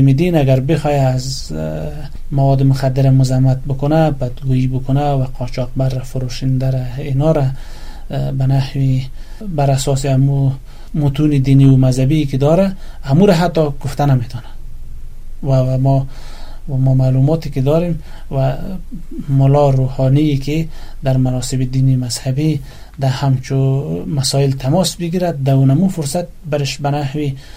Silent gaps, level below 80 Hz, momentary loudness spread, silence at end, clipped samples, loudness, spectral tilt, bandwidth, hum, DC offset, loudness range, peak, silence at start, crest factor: none; -28 dBFS; 13 LU; 0 s; under 0.1%; -15 LUFS; -7 dB/octave; 14.5 kHz; none; under 0.1%; 4 LU; 0 dBFS; 0 s; 14 dB